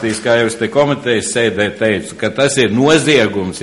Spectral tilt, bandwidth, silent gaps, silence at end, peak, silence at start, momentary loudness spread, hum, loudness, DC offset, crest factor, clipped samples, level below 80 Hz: -4 dB/octave; 11.5 kHz; none; 0 s; 0 dBFS; 0 s; 6 LU; none; -14 LUFS; under 0.1%; 14 dB; under 0.1%; -50 dBFS